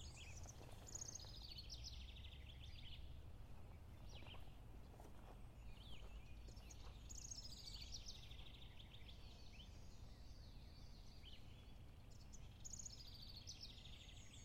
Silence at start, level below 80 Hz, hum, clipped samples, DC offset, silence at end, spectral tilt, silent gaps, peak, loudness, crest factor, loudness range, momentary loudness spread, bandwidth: 0 s; -60 dBFS; none; under 0.1%; under 0.1%; 0 s; -3 dB/octave; none; -40 dBFS; -58 LUFS; 16 dB; 5 LU; 9 LU; 16 kHz